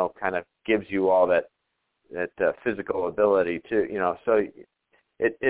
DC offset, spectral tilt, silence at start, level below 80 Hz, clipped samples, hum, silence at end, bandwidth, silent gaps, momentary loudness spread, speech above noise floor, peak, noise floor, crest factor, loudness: under 0.1%; -9.5 dB/octave; 0 s; -60 dBFS; under 0.1%; none; 0 s; 4 kHz; none; 11 LU; 53 dB; -8 dBFS; -77 dBFS; 18 dB; -25 LUFS